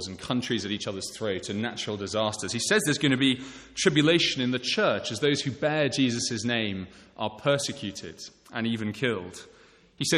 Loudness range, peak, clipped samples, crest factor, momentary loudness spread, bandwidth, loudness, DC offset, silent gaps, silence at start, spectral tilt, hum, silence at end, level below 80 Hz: 6 LU; -6 dBFS; under 0.1%; 22 dB; 13 LU; 13 kHz; -27 LUFS; under 0.1%; none; 0 s; -4 dB/octave; none; 0 s; -62 dBFS